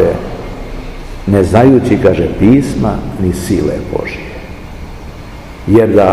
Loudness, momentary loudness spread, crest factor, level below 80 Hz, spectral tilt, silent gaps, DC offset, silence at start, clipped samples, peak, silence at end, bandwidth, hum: -11 LUFS; 21 LU; 12 dB; -28 dBFS; -7.5 dB/octave; none; 0.8%; 0 s; 1%; 0 dBFS; 0 s; 14.5 kHz; none